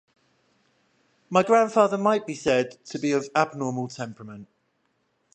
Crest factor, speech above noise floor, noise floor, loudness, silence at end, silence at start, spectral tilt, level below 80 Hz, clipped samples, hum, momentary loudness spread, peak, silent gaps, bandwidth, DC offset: 22 dB; 48 dB; -71 dBFS; -24 LUFS; 0.9 s; 1.3 s; -5.5 dB/octave; -68 dBFS; under 0.1%; none; 16 LU; -4 dBFS; none; 9.2 kHz; under 0.1%